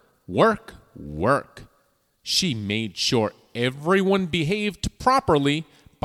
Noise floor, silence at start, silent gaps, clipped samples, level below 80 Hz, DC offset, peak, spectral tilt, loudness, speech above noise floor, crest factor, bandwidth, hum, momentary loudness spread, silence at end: -66 dBFS; 0.3 s; none; under 0.1%; -48 dBFS; under 0.1%; -6 dBFS; -4.5 dB/octave; -23 LUFS; 43 dB; 18 dB; 15 kHz; none; 9 LU; 0.4 s